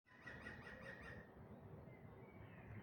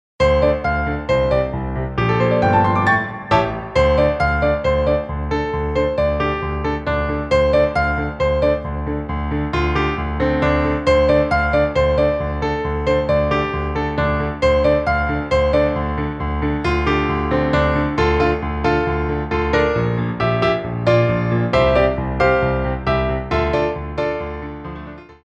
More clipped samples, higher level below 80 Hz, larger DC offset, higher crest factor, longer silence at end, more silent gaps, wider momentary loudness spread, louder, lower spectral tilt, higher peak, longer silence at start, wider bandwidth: neither; second, -72 dBFS vs -28 dBFS; neither; about the same, 16 dB vs 16 dB; about the same, 0 s vs 0.1 s; neither; about the same, 6 LU vs 7 LU; second, -58 LUFS vs -18 LUFS; about the same, -6.5 dB/octave vs -7.5 dB/octave; second, -40 dBFS vs -2 dBFS; second, 0.05 s vs 0.2 s; first, 17 kHz vs 8.2 kHz